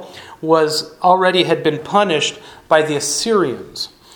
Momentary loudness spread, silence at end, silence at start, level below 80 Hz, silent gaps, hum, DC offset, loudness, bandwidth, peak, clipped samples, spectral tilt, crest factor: 13 LU; 0.3 s; 0 s; -58 dBFS; none; none; under 0.1%; -16 LUFS; 19.5 kHz; 0 dBFS; under 0.1%; -3.5 dB/octave; 16 dB